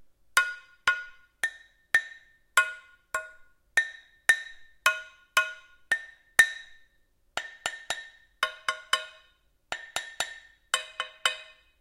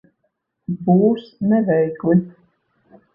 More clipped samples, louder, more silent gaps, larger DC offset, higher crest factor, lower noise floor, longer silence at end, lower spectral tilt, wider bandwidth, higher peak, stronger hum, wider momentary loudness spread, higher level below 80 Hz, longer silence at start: neither; second, -29 LUFS vs -18 LUFS; neither; neither; first, 32 dB vs 16 dB; second, -67 dBFS vs -72 dBFS; second, 0.35 s vs 0.85 s; second, 2 dB/octave vs -12 dB/octave; first, 16 kHz vs 5.4 kHz; about the same, 0 dBFS vs -2 dBFS; neither; about the same, 16 LU vs 15 LU; second, -66 dBFS vs -58 dBFS; second, 0.35 s vs 0.7 s